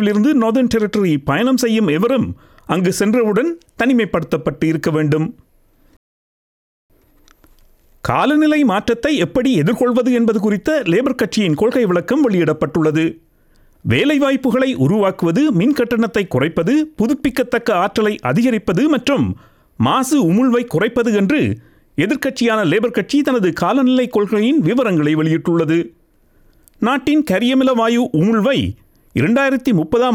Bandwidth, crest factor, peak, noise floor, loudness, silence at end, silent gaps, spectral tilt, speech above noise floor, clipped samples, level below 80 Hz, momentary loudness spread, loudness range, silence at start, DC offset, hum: 17 kHz; 14 dB; -2 dBFS; -53 dBFS; -16 LUFS; 0 s; 5.97-6.89 s; -6 dB/octave; 38 dB; under 0.1%; -48 dBFS; 5 LU; 4 LU; 0 s; under 0.1%; none